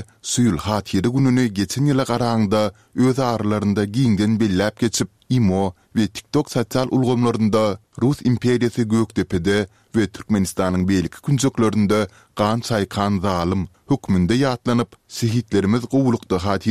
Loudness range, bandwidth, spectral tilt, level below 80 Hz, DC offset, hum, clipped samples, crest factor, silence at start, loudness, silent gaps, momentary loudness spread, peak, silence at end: 1 LU; 15 kHz; -6 dB/octave; -46 dBFS; 0.2%; none; under 0.1%; 16 dB; 0 s; -20 LUFS; none; 5 LU; -4 dBFS; 0 s